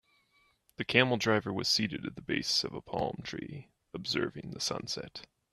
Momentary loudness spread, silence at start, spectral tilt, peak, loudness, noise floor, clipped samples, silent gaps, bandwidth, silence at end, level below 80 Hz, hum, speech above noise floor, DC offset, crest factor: 16 LU; 0.8 s; -3.5 dB/octave; -8 dBFS; -32 LUFS; -71 dBFS; under 0.1%; none; 13.5 kHz; 0.25 s; -64 dBFS; none; 38 dB; under 0.1%; 26 dB